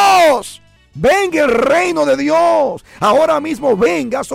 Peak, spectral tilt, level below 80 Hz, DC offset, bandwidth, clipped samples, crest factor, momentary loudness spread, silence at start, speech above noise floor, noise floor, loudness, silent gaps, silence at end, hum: -4 dBFS; -4 dB/octave; -46 dBFS; under 0.1%; 16.5 kHz; under 0.1%; 8 dB; 6 LU; 0 s; 24 dB; -37 dBFS; -13 LUFS; none; 0 s; none